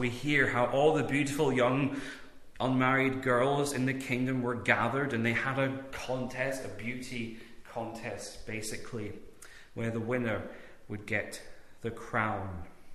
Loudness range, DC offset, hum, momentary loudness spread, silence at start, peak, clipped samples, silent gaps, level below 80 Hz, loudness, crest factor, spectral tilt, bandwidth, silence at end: 9 LU; under 0.1%; none; 17 LU; 0 s; -10 dBFS; under 0.1%; none; -58 dBFS; -31 LUFS; 22 dB; -5.5 dB/octave; 14 kHz; 0 s